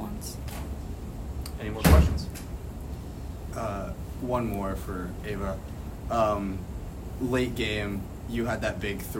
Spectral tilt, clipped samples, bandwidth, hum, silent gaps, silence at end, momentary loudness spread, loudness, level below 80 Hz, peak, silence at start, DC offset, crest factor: -6 dB/octave; under 0.1%; 16 kHz; none; none; 0 s; 13 LU; -30 LUFS; -34 dBFS; -6 dBFS; 0 s; under 0.1%; 24 dB